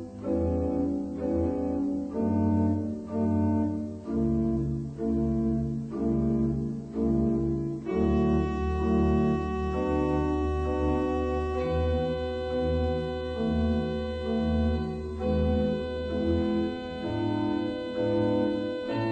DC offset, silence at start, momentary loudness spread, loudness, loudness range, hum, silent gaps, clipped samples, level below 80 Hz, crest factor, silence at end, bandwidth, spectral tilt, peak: under 0.1%; 0 s; 6 LU; -28 LUFS; 2 LU; none; none; under 0.1%; -38 dBFS; 14 dB; 0 s; 8.6 kHz; -9 dB/octave; -14 dBFS